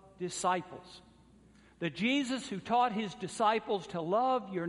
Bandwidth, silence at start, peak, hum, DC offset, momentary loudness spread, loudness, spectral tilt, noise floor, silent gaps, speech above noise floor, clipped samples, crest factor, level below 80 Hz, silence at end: 11.5 kHz; 0.05 s; -16 dBFS; none; under 0.1%; 10 LU; -33 LUFS; -4.5 dB/octave; -61 dBFS; none; 28 dB; under 0.1%; 18 dB; -70 dBFS; 0 s